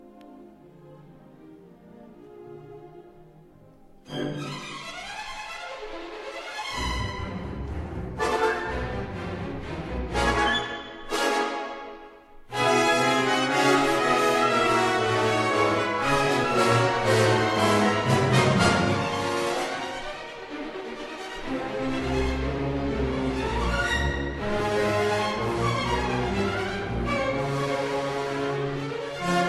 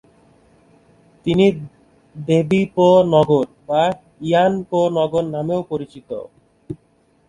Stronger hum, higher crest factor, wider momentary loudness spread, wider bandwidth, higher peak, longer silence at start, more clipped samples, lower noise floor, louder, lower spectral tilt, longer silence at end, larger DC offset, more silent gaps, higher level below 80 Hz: neither; about the same, 18 dB vs 18 dB; second, 15 LU vs 19 LU; first, 13.5 kHz vs 11 kHz; second, -8 dBFS vs 0 dBFS; second, 0.05 s vs 1.25 s; neither; second, -52 dBFS vs -58 dBFS; second, -25 LUFS vs -17 LUFS; second, -5 dB/octave vs -7.5 dB/octave; second, 0 s vs 0.55 s; neither; neither; first, -40 dBFS vs -52 dBFS